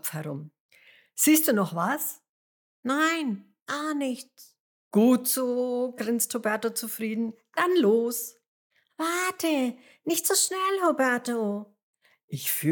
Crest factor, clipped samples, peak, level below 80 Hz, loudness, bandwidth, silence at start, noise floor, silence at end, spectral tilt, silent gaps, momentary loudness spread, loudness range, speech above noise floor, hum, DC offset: 18 dB; under 0.1%; -10 dBFS; under -90 dBFS; -26 LUFS; 19.5 kHz; 0.05 s; under -90 dBFS; 0 s; -3.5 dB/octave; 0.60-0.69 s, 2.29-2.83 s, 3.62-3.66 s, 4.60-4.91 s, 8.48-8.70 s, 11.83-11.94 s, 12.23-12.28 s; 15 LU; 2 LU; over 64 dB; none; under 0.1%